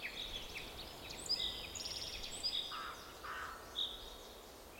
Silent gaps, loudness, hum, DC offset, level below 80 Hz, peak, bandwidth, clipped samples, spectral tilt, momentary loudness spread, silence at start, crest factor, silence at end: none; -42 LUFS; none; under 0.1%; -60 dBFS; -28 dBFS; 16 kHz; under 0.1%; -1 dB/octave; 12 LU; 0 s; 18 dB; 0 s